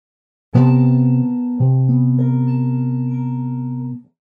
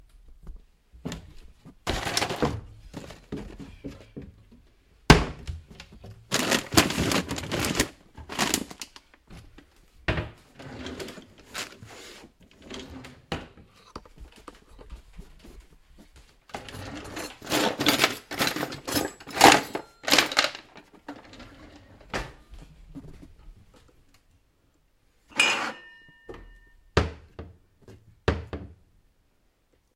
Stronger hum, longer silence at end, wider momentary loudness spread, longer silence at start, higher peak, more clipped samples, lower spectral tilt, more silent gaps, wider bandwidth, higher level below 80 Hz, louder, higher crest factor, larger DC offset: neither; second, 0.25 s vs 1.25 s; second, 11 LU vs 25 LU; first, 0.55 s vs 0.25 s; about the same, -2 dBFS vs 0 dBFS; neither; first, -12 dB/octave vs -3 dB/octave; neither; second, 2.8 kHz vs 16 kHz; second, -60 dBFS vs -44 dBFS; first, -17 LUFS vs -25 LUFS; second, 16 dB vs 30 dB; neither